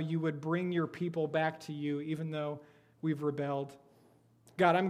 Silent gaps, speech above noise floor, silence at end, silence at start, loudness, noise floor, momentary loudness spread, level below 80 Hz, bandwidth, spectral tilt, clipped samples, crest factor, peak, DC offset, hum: none; 32 dB; 0 s; 0 s; -35 LUFS; -65 dBFS; 8 LU; -80 dBFS; 12 kHz; -7.5 dB/octave; under 0.1%; 22 dB; -12 dBFS; under 0.1%; none